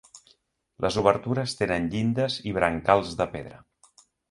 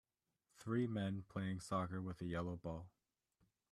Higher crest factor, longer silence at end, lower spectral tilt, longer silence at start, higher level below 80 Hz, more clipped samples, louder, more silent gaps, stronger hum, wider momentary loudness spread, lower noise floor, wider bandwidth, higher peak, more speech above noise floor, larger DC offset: first, 24 dB vs 18 dB; about the same, 0.75 s vs 0.85 s; second, -5.5 dB/octave vs -7 dB/octave; second, 0.15 s vs 0.6 s; first, -50 dBFS vs -70 dBFS; neither; first, -25 LUFS vs -44 LUFS; neither; neither; second, 8 LU vs 11 LU; second, -65 dBFS vs -86 dBFS; about the same, 11.5 kHz vs 12.5 kHz; first, -4 dBFS vs -26 dBFS; about the same, 40 dB vs 43 dB; neither